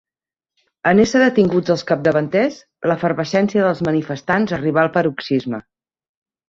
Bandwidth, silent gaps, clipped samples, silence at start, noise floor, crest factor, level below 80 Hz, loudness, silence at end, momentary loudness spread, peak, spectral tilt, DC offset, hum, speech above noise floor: 7.6 kHz; none; under 0.1%; 0.85 s; under -90 dBFS; 16 dB; -54 dBFS; -17 LUFS; 0.9 s; 8 LU; -2 dBFS; -6.5 dB/octave; under 0.1%; none; over 73 dB